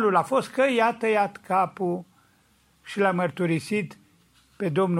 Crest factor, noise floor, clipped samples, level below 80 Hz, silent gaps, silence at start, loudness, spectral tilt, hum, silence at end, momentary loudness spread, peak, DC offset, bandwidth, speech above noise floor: 18 dB; -63 dBFS; under 0.1%; -70 dBFS; none; 0 s; -25 LUFS; -6.5 dB/octave; none; 0 s; 9 LU; -8 dBFS; under 0.1%; 15.5 kHz; 39 dB